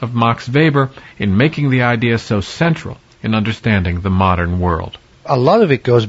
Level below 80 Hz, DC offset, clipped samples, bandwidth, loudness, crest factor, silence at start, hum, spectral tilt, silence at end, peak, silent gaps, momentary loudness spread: -38 dBFS; under 0.1%; under 0.1%; 8 kHz; -15 LUFS; 14 dB; 0 s; none; -7.5 dB/octave; 0 s; 0 dBFS; none; 10 LU